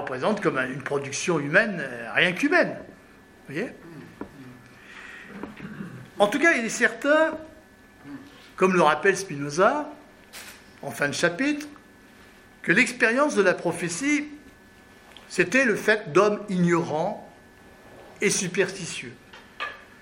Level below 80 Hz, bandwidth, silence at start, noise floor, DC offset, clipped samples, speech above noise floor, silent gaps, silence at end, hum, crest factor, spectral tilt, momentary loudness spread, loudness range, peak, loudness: -64 dBFS; 16 kHz; 0 s; -51 dBFS; under 0.1%; under 0.1%; 28 dB; none; 0.2 s; none; 22 dB; -4 dB/octave; 21 LU; 5 LU; -4 dBFS; -23 LUFS